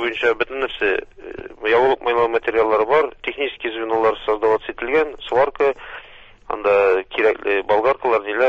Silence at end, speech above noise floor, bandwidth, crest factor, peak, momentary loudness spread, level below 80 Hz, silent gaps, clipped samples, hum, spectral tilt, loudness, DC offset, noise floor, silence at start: 0 s; 25 dB; 7 kHz; 16 dB; -4 dBFS; 9 LU; -52 dBFS; none; under 0.1%; none; -5.5 dB/octave; -19 LUFS; under 0.1%; -44 dBFS; 0 s